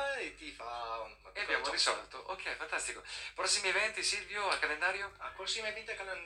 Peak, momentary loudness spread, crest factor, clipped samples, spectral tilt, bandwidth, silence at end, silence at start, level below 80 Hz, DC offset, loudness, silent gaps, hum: -16 dBFS; 12 LU; 20 dB; under 0.1%; 0.5 dB/octave; 15.5 kHz; 0 s; 0 s; -64 dBFS; under 0.1%; -35 LUFS; none; 50 Hz at -65 dBFS